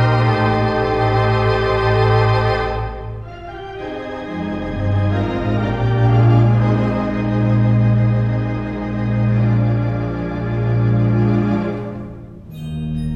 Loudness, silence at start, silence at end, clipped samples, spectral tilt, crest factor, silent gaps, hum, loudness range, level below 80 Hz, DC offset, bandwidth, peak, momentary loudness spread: -17 LUFS; 0 s; 0 s; under 0.1%; -9 dB/octave; 14 dB; none; none; 5 LU; -32 dBFS; under 0.1%; 5.6 kHz; -4 dBFS; 14 LU